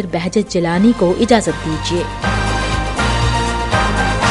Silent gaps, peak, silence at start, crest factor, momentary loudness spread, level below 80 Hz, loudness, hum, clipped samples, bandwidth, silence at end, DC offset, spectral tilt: none; 0 dBFS; 0 s; 16 dB; 6 LU; -24 dBFS; -16 LUFS; none; under 0.1%; 11.5 kHz; 0 s; under 0.1%; -5 dB/octave